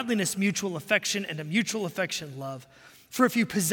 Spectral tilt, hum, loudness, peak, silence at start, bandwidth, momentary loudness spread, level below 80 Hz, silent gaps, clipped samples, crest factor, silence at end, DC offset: -3.5 dB/octave; none; -27 LUFS; -8 dBFS; 0 s; 17 kHz; 13 LU; -70 dBFS; none; under 0.1%; 20 dB; 0 s; under 0.1%